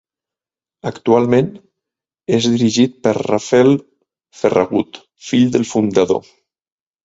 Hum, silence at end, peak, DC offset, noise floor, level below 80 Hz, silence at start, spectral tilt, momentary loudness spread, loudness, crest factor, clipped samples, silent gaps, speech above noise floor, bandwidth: none; 0.85 s; 0 dBFS; under 0.1%; -89 dBFS; -54 dBFS; 0.85 s; -5.5 dB/octave; 12 LU; -16 LUFS; 16 dB; under 0.1%; none; 74 dB; 7.8 kHz